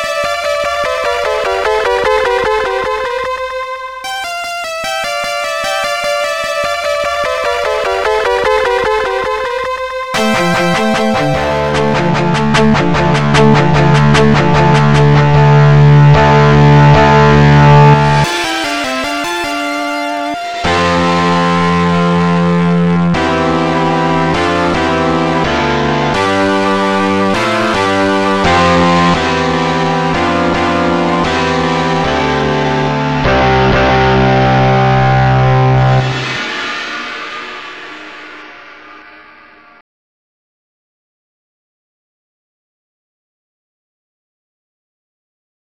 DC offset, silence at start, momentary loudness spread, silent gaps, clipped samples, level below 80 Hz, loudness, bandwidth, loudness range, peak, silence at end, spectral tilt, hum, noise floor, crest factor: 1%; 0 s; 10 LU; none; under 0.1%; -30 dBFS; -11 LUFS; 13 kHz; 9 LU; 0 dBFS; 5.9 s; -6 dB/octave; none; -40 dBFS; 12 dB